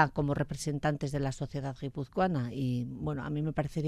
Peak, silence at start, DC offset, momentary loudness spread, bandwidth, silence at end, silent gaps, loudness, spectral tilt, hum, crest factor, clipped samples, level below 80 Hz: -10 dBFS; 0 s; under 0.1%; 6 LU; 13.5 kHz; 0 s; none; -33 LUFS; -6.5 dB/octave; none; 22 dB; under 0.1%; -52 dBFS